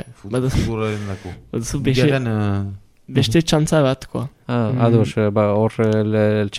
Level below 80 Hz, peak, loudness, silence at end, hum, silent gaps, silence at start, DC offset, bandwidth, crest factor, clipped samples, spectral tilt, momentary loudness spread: -38 dBFS; -2 dBFS; -19 LUFS; 0 s; none; none; 0.05 s; under 0.1%; 14.5 kHz; 16 dB; under 0.1%; -6.5 dB/octave; 12 LU